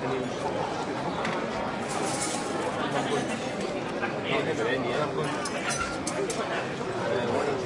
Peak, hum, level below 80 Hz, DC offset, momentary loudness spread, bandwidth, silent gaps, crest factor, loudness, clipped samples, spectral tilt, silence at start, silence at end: -14 dBFS; none; -58 dBFS; under 0.1%; 3 LU; 12 kHz; none; 16 dB; -29 LUFS; under 0.1%; -4 dB/octave; 0 s; 0 s